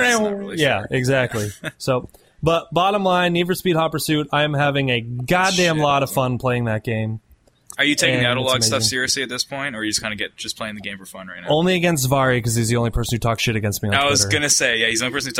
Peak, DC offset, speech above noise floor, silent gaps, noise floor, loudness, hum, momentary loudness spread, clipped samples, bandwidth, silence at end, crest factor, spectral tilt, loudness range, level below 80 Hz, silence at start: 0 dBFS; under 0.1%; 26 dB; none; -46 dBFS; -19 LUFS; none; 10 LU; under 0.1%; 16 kHz; 0 s; 20 dB; -3.5 dB/octave; 3 LU; -42 dBFS; 0 s